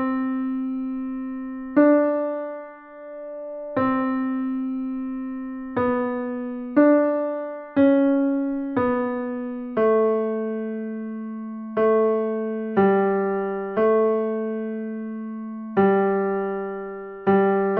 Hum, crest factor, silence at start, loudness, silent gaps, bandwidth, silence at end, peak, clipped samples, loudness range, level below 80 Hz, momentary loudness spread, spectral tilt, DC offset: none; 16 dB; 0 s; -23 LUFS; none; 4.3 kHz; 0 s; -6 dBFS; under 0.1%; 4 LU; -60 dBFS; 13 LU; -7.5 dB/octave; under 0.1%